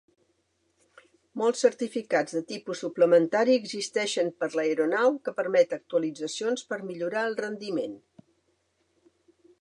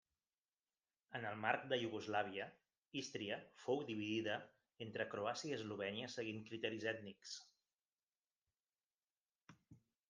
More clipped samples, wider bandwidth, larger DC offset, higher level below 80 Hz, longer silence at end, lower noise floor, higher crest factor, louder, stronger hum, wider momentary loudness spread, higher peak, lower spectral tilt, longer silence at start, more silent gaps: neither; first, 11 kHz vs 9.6 kHz; neither; first, -82 dBFS vs -90 dBFS; first, 1.65 s vs 0.3 s; second, -72 dBFS vs under -90 dBFS; second, 20 dB vs 26 dB; first, -27 LUFS vs -45 LUFS; neither; about the same, 11 LU vs 11 LU; first, -8 dBFS vs -22 dBFS; about the same, -4 dB/octave vs -4.5 dB/octave; first, 1.35 s vs 1.1 s; second, none vs 2.78-2.82 s, 8.03-8.07 s, 8.36-8.40 s, 8.60-8.64 s, 8.86-8.99 s, 9.17-9.21 s